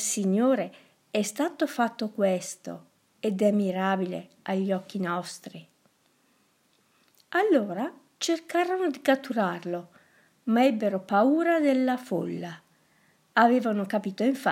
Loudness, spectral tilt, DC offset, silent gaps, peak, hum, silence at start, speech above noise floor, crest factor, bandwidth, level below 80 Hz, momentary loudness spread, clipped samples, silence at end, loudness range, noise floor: -27 LUFS; -5 dB/octave; under 0.1%; none; -6 dBFS; none; 0 s; 41 dB; 20 dB; 16 kHz; -84 dBFS; 14 LU; under 0.1%; 0 s; 6 LU; -67 dBFS